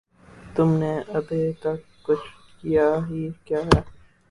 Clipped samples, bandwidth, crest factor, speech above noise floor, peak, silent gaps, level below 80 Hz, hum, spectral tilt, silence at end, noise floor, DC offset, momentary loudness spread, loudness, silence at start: under 0.1%; 11.5 kHz; 24 dB; 24 dB; -2 dBFS; none; -40 dBFS; none; -7.5 dB/octave; 0.35 s; -47 dBFS; under 0.1%; 10 LU; -24 LUFS; 0.35 s